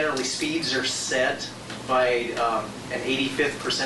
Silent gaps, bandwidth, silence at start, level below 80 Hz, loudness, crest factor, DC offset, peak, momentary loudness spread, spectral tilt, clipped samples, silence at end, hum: none; 11.5 kHz; 0 s; -56 dBFS; -25 LUFS; 14 dB; under 0.1%; -12 dBFS; 8 LU; -2.5 dB/octave; under 0.1%; 0 s; none